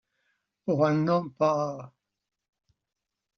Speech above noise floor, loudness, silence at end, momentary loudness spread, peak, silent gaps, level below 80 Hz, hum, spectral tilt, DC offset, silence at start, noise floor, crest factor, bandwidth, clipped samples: 61 dB; -26 LUFS; 1.5 s; 12 LU; -12 dBFS; none; -72 dBFS; none; -7 dB/octave; under 0.1%; 0.65 s; -86 dBFS; 18 dB; 6.6 kHz; under 0.1%